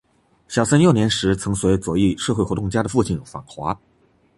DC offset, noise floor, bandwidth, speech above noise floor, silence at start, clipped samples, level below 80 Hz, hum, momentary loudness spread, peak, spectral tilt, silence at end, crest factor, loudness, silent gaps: under 0.1%; -53 dBFS; 11.5 kHz; 34 dB; 0.5 s; under 0.1%; -40 dBFS; none; 13 LU; -2 dBFS; -5.5 dB/octave; 0.6 s; 18 dB; -20 LUFS; none